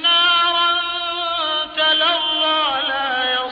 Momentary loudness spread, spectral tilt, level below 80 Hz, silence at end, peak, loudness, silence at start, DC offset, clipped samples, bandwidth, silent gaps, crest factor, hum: 7 LU; -3 dB/octave; -56 dBFS; 0 s; -6 dBFS; -16 LUFS; 0 s; under 0.1%; under 0.1%; 5.4 kHz; none; 12 dB; none